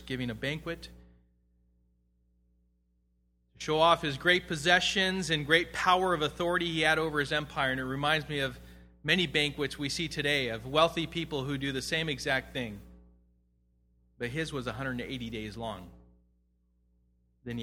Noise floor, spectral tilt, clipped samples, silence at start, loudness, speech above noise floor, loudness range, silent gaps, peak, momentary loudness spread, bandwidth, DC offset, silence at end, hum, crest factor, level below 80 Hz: -72 dBFS; -4 dB/octave; under 0.1%; 0 s; -29 LUFS; 42 dB; 12 LU; none; -8 dBFS; 14 LU; 16.5 kHz; under 0.1%; 0 s; none; 24 dB; -54 dBFS